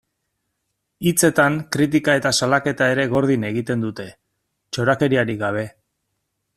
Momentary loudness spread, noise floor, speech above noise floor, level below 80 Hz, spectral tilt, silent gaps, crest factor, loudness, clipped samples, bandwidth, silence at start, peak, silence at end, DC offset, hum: 11 LU; -75 dBFS; 56 dB; -56 dBFS; -4.5 dB/octave; none; 18 dB; -19 LUFS; under 0.1%; 15 kHz; 1 s; -2 dBFS; 0.85 s; under 0.1%; none